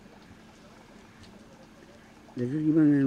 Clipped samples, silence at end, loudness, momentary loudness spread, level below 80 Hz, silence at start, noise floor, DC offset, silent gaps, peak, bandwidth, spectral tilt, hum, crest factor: under 0.1%; 0 s; -26 LUFS; 28 LU; -64 dBFS; 0.3 s; -52 dBFS; under 0.1%; none; -14 dBFS; 7.2 kHz; -9 dB/octave; none; 16 dB